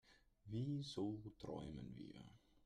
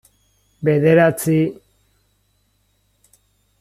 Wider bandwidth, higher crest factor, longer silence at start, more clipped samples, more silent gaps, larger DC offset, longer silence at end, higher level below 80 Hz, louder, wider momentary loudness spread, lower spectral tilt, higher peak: second, 11 kHz vs 15.5 kHz; about the same, 14 dB vs 18 dB; second, 0.05 s vs 0.6 s; neither; neither; neither; second, 0.05 s vs 2.05 s; second, -70 dBFS vs -58 dBFS; second, -49 LUFS vs -16 LUFS; first, 16 LU vs 10 LU; about the same, -7 dB/octave vs -7 dB/octave; second, -34 dBFS vs -2 dBFS